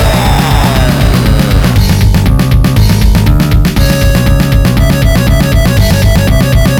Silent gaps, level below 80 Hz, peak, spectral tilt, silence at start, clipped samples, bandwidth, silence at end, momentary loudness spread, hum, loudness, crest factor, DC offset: none; -10 dBFS; 0 dBFS; -6 dB/octave; 0 s; under 0.1%; 18 kHz; 0 s; 1 LU; none; -8 LUFS; 6 dB; 0.5%